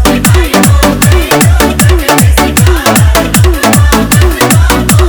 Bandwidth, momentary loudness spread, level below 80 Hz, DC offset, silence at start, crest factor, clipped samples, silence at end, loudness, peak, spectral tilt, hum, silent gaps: over 20 kHz; 1 LU; -12 dBFS; under 0.1%; 0 s; 6 dB; 3%; 0 s; -6 LUFS; 0 dBFS; -4.5 dB/octave; none; none